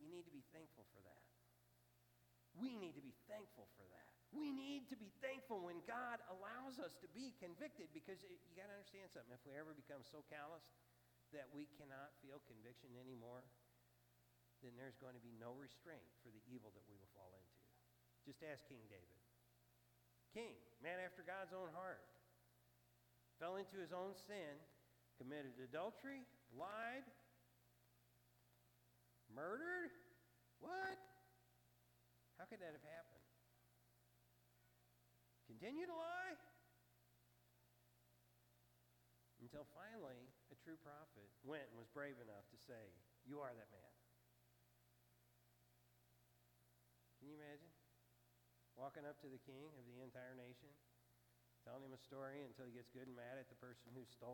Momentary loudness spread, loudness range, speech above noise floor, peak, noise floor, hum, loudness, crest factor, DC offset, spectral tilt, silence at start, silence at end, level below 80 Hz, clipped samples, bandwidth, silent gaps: 16 LU; 10 LU; 22 dB; -36 dBFS; -78 dBFS; 60 Hz at -80 dBFS; -56 LUFS; 22 dB; under 0.1%; -5.5 dB/octave; 0 s; 0 s; -90 dBFS; under 0.1%; 18 kHz; none